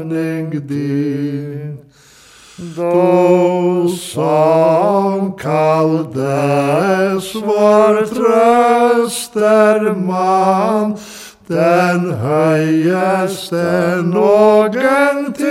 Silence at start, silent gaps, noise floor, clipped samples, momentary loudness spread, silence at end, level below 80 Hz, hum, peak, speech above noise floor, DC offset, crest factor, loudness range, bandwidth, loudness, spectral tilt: 0 s; none; -42 dBFS; under 0.1%; 10 LU; 0 s; -58 dBFS; none; 0 dBFS; 29 dB; under 0.1%; 12 dB; 4 LU; 16 kHz; -13 LUFS; -6.5 dB/octave